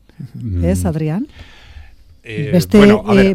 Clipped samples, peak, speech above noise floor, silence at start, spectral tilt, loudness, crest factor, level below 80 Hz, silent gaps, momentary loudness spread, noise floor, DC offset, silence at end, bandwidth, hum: under 0.1%; 0 dBFS; 26 dB; 0.2 s; -7 dB/octave; -14 LUFS; 14 dB; -36 dBFS; none; 19 LU; -39 dBFS; under 0.1%; 0 s; 15.5 kHz; none